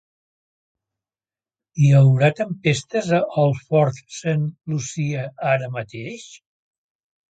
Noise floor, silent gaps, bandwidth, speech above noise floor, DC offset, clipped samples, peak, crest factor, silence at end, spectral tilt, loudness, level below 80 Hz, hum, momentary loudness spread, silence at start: under -90 dBFS; none; 9 kHz; over 71 dB; under 0.1%; under 0.1%; -2 dBFS; 18 dB; 0.95 s; -6.5 dB/octave; -20 LUFS; -60 dBFS; none; 16 LU; 1.75 s